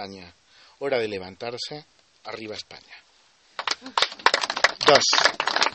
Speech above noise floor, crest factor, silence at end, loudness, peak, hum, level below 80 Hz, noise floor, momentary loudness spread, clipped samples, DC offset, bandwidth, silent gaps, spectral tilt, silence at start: 34 dB; 24 dB; 0 s; -22 LUFS; 0 dBFS; none; -64 dBFS; -59 dBFS; 22 LU; under 0.1%; under 0.1%; 8.8 kHz; none; -1 dB/octave; 0 s